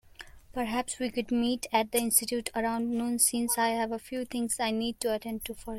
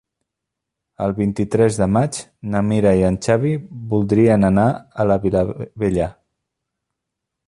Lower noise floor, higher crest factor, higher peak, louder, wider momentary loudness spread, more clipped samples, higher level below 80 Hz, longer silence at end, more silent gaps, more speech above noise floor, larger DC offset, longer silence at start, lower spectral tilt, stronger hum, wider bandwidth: second, -50 dBFS vs -81 dBFS; about the same, 20 dB vs 16 dB; second, -10 dBFS vs -2 dBFS; second, -29 LUFS vs -18 LUFS; about the same, 10 LU vs 10 LU; neither; second, -56 dBFS vs -42 dBFS; second, 0 s vs 1.35 s; neither; second, 20 dB vs 64 dB; neither; second, 0.2 s vs 1 s; second, -2.5 dB/octave vs -7.5 dB/octave; neither; first, 16.5 kHz vs 11.5 kHz